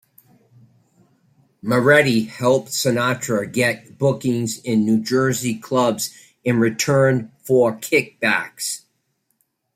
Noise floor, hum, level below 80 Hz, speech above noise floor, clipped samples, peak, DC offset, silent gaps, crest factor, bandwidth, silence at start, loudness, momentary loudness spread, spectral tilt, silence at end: -70 dBFS; none; -62 dBFS; 51 dB; under 0.1%; -2 dBFS; under 0.1%; none; 18 dB; 16 kHz; 1.65 s; -19 LUFS; 9 LU; -5 dB/octave; 1 s